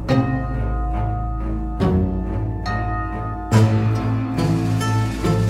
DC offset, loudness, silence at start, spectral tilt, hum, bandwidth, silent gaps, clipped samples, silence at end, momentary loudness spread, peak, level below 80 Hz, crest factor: under 0.1%; -21 LUFS; 0 s; -7.5 dB/octave; none; 13 kHz; none; under 0.1%; 0 s; 8 LU; -2 dBFS; -28 dBFS; 16 dB